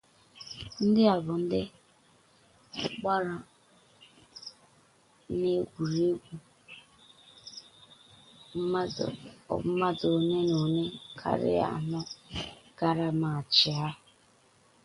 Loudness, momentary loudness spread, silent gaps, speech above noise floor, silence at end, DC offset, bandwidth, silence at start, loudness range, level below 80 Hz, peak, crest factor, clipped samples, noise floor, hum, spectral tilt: -29 LUFS; 22 LU; none; 35 dB; 0.9 s; under 0.1%; 11.5 kHz; 0.35 s; 8 LU; -62 dBFS; -10 dBFS; 22 dB; under 0.1%; -63 dBFS; none; -6 dB/octave